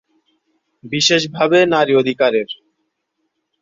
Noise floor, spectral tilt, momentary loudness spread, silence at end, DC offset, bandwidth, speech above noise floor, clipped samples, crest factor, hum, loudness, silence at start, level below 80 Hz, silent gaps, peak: -72 dBFS; -3.5 dB/octave; 13 LU; 1.05 s; under 0.1%; 7.8 kHz; 57 dB; under 0.1%; 18 dB; none; -15 LUFS; 0.85 s; -60 dBFS; none; 0 dBFS